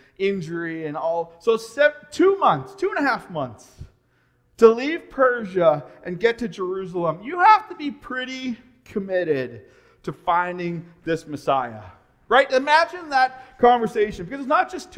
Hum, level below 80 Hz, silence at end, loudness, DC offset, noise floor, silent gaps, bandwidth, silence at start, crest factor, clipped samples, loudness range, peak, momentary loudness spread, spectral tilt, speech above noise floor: none; -56 dBFS; 0 s; -21 LUFS; under 0.1%; -63 dBFS; none; 12 kHz; 0.2 s; 22 dB; under 0.1%; 5 LU; 0 dBFS; 14 LU; -5.5 dB/octave; 42 dB